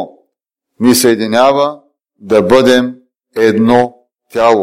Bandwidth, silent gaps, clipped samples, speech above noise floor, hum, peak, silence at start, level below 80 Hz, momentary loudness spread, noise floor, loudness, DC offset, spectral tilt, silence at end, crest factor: 16.5 kHz; none; under 0.1%; 64 dB; none; 0 dBFS; 0 s; -50 dBFS; 13 LU; -73 dBFS; -11 LUFS; under 0.1%; -4.5 dB/octave; 0 s; 12 dB